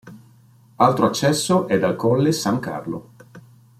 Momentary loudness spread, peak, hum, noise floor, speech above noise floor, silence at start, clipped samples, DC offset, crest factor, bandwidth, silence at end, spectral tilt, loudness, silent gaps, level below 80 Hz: 12 LU; -2 dBFS; none; -52 dBFS; 33 dB; 0.05 s; under 0.1%; under 0.1%; 18 dB; 16 kHz; 0.4 s; -5.5 dB/octave; -19 LUFS; none; -58 dBFS